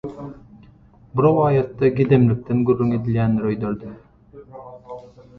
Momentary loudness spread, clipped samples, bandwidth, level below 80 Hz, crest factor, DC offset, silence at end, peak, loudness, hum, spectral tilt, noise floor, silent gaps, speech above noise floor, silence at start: 23 LU; under 0.1%; 4.7 kHz; -48 dBFS; 18 dB; under 0.1%; 0.2 s; -2 dBFS; -19 LUFS; none; -11 dB/octave; -49 dBFS; none; 31 dB; 0.05 s